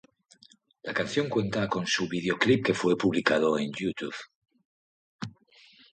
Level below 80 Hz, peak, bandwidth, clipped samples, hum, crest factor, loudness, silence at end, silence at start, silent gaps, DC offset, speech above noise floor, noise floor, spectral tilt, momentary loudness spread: -64 dBFS; -8 dBFS; 9.4 kHz; under 0.1%; none; 22 dB; -27 LUFS; 0.6 s; 0.85 s; 4.35-4.42 s, 4.65-5.19 s; under 0.1%; 33 dB; -60 dBFS; -5 dB/octave; 18 LU